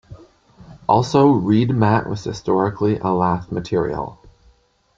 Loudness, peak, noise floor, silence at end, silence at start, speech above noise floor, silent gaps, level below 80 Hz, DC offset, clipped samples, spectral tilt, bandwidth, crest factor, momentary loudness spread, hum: -19 LUFS; -2 dBFS; -57 dBFS; 0.85 s; 0.1 s; 39 dB; none; -48 dBFS; under 0.1%; under 0.1%; -7.5 dB/octave; 7.6 kHz; 18 dB; 12 LU; none